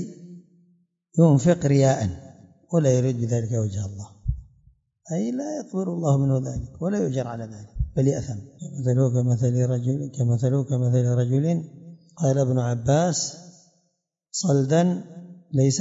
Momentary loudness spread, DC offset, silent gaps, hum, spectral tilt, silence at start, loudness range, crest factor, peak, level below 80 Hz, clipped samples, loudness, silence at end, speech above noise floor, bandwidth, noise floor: 14 LU; under 0.1%; none; none; -7 dB/octave; 0 s; 5 LU; 18 dB; -4 dBFS; -44 dBFS; under 0.1%; -23 LUFS; 0 s; 52 dB; 7.8 kHz; -74 dBFS